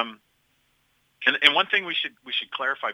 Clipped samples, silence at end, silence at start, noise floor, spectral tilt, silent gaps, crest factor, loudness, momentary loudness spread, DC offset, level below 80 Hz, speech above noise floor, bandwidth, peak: under 0.1%; 0 s; 0 s; -68 dBFS; -2 dB/octave; none; 24 dB; -22 LUFS; 11 LU; under 0.1%; -76 dBFS; 44 dB; 16.5 kHz; -2 dBFS